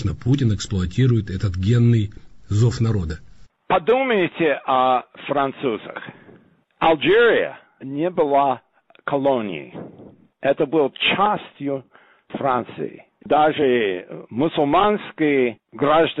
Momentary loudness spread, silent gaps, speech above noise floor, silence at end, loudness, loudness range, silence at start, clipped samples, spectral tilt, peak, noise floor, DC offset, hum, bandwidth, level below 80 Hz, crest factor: 14 LU; none; 33 dB; 0 s; -20 LUFS; 3 LU; 0 s; under 0.1%; -7 dB/octave; -8 dBFS; -53 dBFS; under 0.1%; none; 8 kHz; -46 dBFS; 12 dB